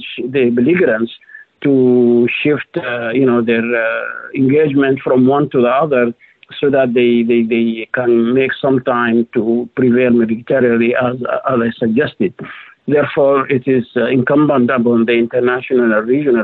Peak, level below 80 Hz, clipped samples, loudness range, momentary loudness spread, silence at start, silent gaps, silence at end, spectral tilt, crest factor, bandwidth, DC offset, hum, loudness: -4 dBFS; -56 dBFS; under 0.1%; 2 LU; 7 LU; 0 s; none; 0 s; -10 dB/octave; 10 dB; 4.2 kHz; under 0.1%; none; -14 LUFS